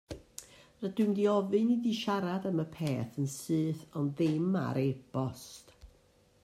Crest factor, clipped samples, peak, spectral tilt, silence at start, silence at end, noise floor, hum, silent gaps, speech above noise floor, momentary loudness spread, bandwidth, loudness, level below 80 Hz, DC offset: 16 dB; under 0.1%; -18 dBFS; -6.5 dB/octave; 0.1 s; 0.55 s; -65 dBFS; none; none; 34 dB; 17 LU; 15.5 kHz; -32 LUFS; -64 dBFS; under 0.1%